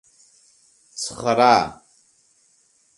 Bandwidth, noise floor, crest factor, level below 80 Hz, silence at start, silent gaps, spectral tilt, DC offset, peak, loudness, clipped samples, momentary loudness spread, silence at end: 11.5 kHz; -61 dBFS; 24 dB; -60 dBFS; 0.95 s; none; -3.5 dB/octave; under 0.1%; 0 dBFS; -19 LUFS; under 0.1%; 15 LU; 1.25 s